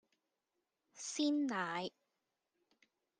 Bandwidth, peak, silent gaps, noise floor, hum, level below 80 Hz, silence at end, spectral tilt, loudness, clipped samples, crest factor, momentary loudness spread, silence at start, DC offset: 10 kHz; -24 dBFS; none; -88 dBFS; none; under -90 dBFS; 1.3 s; -3 dB/octave; -39 LUFS; under 0.1%; 18 dB; 12 LU; 0.95 s; under 0.1%